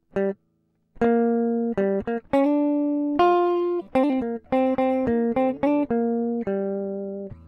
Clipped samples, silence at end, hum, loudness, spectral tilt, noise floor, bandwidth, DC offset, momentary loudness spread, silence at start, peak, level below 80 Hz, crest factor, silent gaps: under 0.1%; 0 s; none; -23 LUFS; -8.5 dB/octave; -69 dBFS; 6 kHz; under 0.1%; 7 LU; 0.15 s; -8 dBFS; -54 dBFS; 16 dB; none